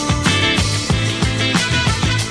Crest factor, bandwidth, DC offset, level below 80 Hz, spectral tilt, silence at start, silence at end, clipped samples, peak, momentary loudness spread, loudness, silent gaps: 16 dB; 11 kHz; under 0.1%; -28 dBFS; -4 dB/octave; 0 s; 0 s; under 0.1%; 0 dBFS; 3 LU; -16 LUFS; none